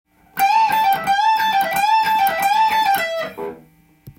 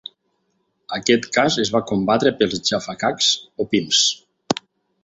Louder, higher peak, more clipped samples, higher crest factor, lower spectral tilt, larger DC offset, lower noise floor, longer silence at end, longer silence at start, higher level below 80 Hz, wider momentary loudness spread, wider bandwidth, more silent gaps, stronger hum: about the same, -17 LUFS vs -19 LUFS; about the same, -4 dBFS vs -2 dBFS; neither; second, 14 dB vs 20 dB; second, -1.5 dB/octave vs -3 dB/octave; neither; second, -50 dBFS vs -69 dBFS; second, 0.1 s vs 0.5 s; second, 0.35 s vs 0.9 s; about the same, -58 dBFS vs -56 dBFS; about the same, 11 LU vs 10 LU; first, 17 kHz vs 8.2 kHz; neither; neither